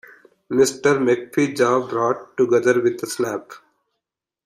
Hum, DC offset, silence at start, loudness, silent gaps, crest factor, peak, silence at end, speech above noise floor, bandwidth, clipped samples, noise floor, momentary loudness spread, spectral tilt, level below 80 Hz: none; under 0.1%; 0.5 s; -20 LUFS; none; 16 dB; -4 dBFS; 0.9 s; 64 dB; 15.5 kHz; under 0.1%; -83 dBFS; 8 LU; -5 dB/octave; -64 dBFS